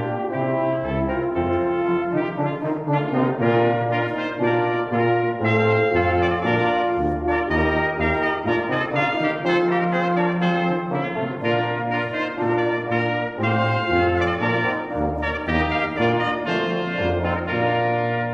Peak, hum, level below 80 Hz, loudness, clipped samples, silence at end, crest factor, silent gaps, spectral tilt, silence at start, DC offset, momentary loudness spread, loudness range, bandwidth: -6 dBFS; none; -42 dBFS; -21 LUFS; under 0.1%; 0 s; 14 dB; none; -8 dB/octave; 0 s; under 0.1%; 4 LU; 2 LU; 6.6 kHz